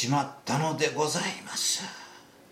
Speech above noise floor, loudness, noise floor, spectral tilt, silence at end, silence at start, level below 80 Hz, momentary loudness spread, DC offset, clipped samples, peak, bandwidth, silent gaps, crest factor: 21 dB; -28 LUFS; -50 dBFS; -3 dB/octave; 0.3 s; 0 s; -74 dBFS; 13 LU; under 0.1%; under 0.1%; -10 dBFS; 16.5 kHz; none; 18 dB